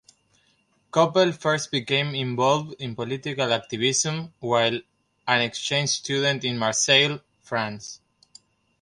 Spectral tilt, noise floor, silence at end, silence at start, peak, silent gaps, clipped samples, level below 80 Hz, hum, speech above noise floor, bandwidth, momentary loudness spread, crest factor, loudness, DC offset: -3 dB/octave; -66 dBFS; 0.85 s; 0.95 s; -4 dBFS; none; under 0.1%; -66 dBFS; none; 42 dB; 11.5 kHz; 13 LU; 22 dB; -23 LUFS; under 0.1%